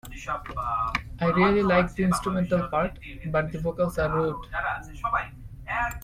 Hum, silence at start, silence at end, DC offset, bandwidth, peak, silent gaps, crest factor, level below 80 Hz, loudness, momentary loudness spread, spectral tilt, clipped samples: none; 0.05 s; 0 s; under 0.1%; 15.5 kHz; -8 dBFS; none; 18 dB; -42 dBFS; -26 LUFS; 11 LU; -6.5 dB/octave; under 0.1%